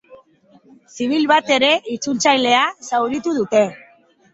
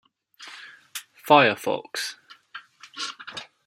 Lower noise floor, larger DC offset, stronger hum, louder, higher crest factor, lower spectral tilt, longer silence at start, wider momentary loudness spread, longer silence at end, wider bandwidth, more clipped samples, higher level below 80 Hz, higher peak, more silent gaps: first, -52 dBFS vs -48 dBFS; neither; neither; first, -17 LUFS vs -23 LUFS; second, 18 dB vs 24 dB; about the same, -2.5 dB/octave vs -3.5 dB/octave; second, 0.1 s vs 0.4 s; second, 7 LU vs 26 LU; first, 0.55 s vs 0.25 s; second, 8 kHz vs 16 kHz; neither; first, -64 dBFS vs -76 dBFS; about the same, -2 dBFS vs -2 dBFS; neither